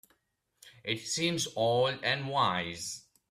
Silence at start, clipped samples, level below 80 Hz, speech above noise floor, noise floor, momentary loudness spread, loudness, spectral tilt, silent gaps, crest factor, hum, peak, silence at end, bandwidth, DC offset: 0.65 s; under 0.1%; -70 dBFS; 47 dB; -77 dBFS; 11 LU; -31 LUFS; -3.5 dB/octave; none; 18 dB; none; -14 dBFS; 0.3 s; 15.5 kHz; under 0.1%